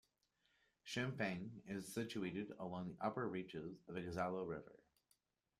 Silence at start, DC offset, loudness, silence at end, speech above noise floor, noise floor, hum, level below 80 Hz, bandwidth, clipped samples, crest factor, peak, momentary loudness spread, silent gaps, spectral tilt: 0.85 s; under 0.1%; -46 LUFS; 0.85 s; 37 dB; -83 dBFS; none; -76 dBFS; 15 kHz; under 0.1%; 20 dB; -26 dBFS; 8 LU; none; -5.5 dB/octave